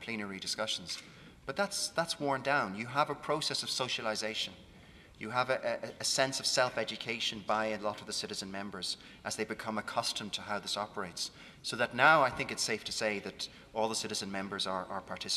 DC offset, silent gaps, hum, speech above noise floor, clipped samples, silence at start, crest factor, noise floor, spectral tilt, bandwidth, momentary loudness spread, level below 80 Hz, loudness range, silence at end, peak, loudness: under 0.1%; none; none; 21 dB; under 0.1%; 0 s; 26 dB; -56 dBFS; -2.5 dB/octave; 14.5 kHz; 10 LU; -66 dBFS; 5 LU; 0 s; -8 dBFS; -34 LUFS